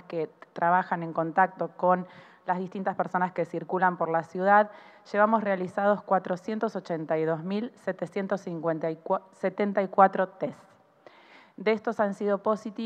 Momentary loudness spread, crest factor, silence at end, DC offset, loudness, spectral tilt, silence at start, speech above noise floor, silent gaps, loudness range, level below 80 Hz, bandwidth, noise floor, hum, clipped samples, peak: 10 LU; 22 dB; 0 s; under 0.1%; -28 LUFS; -7.5 dB/octave; 0.1 s; 28 dB; none; 4 LU; -86 dBFS; 9.2 kHz; -56 dBFS; none; under 0.1%; -6 dBFS